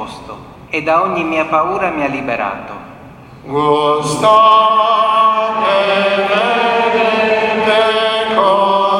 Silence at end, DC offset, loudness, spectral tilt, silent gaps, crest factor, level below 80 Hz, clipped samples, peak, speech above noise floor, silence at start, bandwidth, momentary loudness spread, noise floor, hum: 0 s; under 0.1%; -13 LUFS; -4 dB/octave; none; 14 dB; -50 dBFS; under 0.1%; 0 dBFS; 23 dB; 0 s; 12.5 kHz; 12 LU; -36 dBFS; none